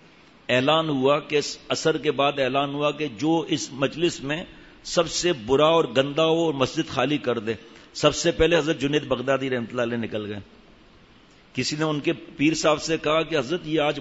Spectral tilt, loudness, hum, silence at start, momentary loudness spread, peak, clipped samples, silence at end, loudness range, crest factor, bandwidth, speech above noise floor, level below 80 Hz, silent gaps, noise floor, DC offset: -4.5 dB/octave; -23 LUFS; none; 0.5 s; 9 LU; -6 dBFS; under 0.1%; 0 s; 4 LU; 18 dB; 8 kHz; 30 dB; -50 dBFS; none; -53 dBFS; under 0.1%